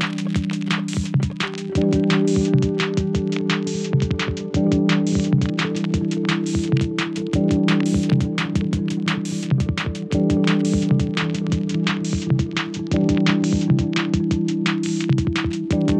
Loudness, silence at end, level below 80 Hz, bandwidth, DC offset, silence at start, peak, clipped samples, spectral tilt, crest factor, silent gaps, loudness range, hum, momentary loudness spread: -21 LUFS; 0 s; -40 dBFS; 10 kHz; under 0.1%; 0 s; -4 dBFS; under 0.1%; -6 dB/octave; 16 dB; none; 1 LU; none; 5 LU